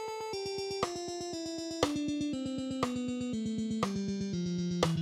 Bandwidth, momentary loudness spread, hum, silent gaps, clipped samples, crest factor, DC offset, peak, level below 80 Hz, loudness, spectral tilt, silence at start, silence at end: 15 kHz; 6 LU; none; none; under 0.1%; 22 dB; under 0.1%; -12 dBFS; -60 dBFS; -35 LUFS; -5.5 dB/octave; 0 s; 0 s